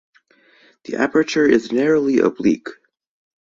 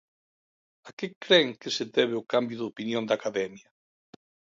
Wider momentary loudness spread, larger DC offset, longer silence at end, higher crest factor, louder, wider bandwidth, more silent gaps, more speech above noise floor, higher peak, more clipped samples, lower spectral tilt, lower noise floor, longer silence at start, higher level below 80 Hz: second, 10 LU vs 16 LU; neither; second, 0.7 s vs 1 s; about the same, 18 dB vs 22 dB; first, -17 LUFS vs -27 LUFS; about the same, 7.6 kHz vs 7.8 kHz; second, none vs 0.93-0.97 s, 1.16-1.21 s; second, 38 dB vs over 62 dB; first, -2 dBFS vs -6 dBFS; neither; first, -5.5 dB/octave vs -4 dB/octave; second, -55 dBFS vs under -90 dBFS; about the same, 0.9 s vs 0.85 s; first, -58 dBFS vs -78 dBFS